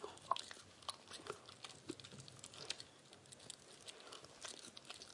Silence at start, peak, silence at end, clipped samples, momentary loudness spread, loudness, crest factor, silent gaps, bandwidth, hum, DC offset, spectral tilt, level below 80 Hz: 0 s; -20 dBFS; 0 s; under 0.1%; 11 LU; -51 LUFS; 32 dB; none; 11.5 kHz; none; under 0.1%; -2 dB/octave; -84 dBFS